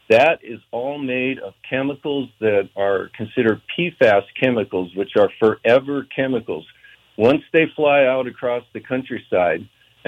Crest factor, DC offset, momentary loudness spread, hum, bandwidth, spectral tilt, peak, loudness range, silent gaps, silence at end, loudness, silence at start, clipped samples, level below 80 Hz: 16 dB; under 0.1%; 11 LU; none; 8.4 kHz; -7 dB/octave; -4 dBFS; 3 LU; none; 0.4 s; -19 LUFS; 0.1 s; under 0.1%; -62 dBFS